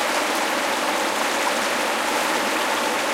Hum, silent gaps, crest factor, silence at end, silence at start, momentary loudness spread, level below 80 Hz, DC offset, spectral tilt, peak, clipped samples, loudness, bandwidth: none; none; 14 dB; 0 s; 0 s; 1 LU; -64 dBFS; under 0.1%; -1 dB/octave; -8 dBFS; under 0.1%; -21 LUFS; 16.5 kHz